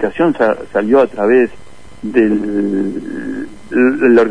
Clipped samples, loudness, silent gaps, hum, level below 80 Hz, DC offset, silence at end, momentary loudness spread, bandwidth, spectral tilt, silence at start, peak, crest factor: under 0.1%; -14 LUFS; none; none; -46 dBFS; 2%; 0 s; 12 LU; 10 kHz; -7.5 dB/octave; 0 s; 0 dBFS; 14 dB